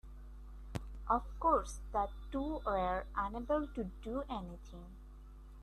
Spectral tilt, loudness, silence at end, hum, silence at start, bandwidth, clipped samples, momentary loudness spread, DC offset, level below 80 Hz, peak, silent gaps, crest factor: -6.5 dB/octave; -38 LUFS; 0 s; none; 0.05 s; 13 kHz; under 0.1%; 22 LU; under 0.1%; -48 dBFS; -18 dBFS; none; 20 dB